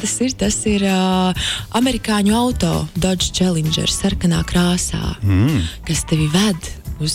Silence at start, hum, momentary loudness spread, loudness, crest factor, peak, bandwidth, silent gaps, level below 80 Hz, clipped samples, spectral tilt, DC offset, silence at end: 0 s; none; 5 LU; -17 LUFS; 10 dB; -6 dBFS; 16.5 kHz; none; -32 dBFS; under 0.1%; -4.5 dB/octave; under 0.1%; 0 s